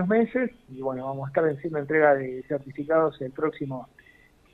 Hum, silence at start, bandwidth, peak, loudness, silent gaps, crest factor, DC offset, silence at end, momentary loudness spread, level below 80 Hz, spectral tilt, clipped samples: none; 0 s; 4.1 kHz; -8 dBFS; -26 LUFS; none; 20 dB; under 0.1%; 0.7 s; 12 LU; -62 dBFS; -9.5 dB/octave; under 0.1%